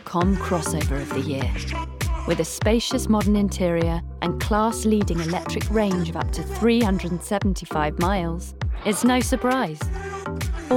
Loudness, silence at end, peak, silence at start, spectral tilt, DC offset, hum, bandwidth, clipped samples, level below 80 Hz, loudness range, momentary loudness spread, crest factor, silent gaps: -23 LUFS; 0 s; -8 dBFS; 0 s; -5.5 dB/octave; under 0.1%; none; 17.5 kHz; under 0.1%; -32 dBFS; 2 LU; 9 LU; 14 dB; none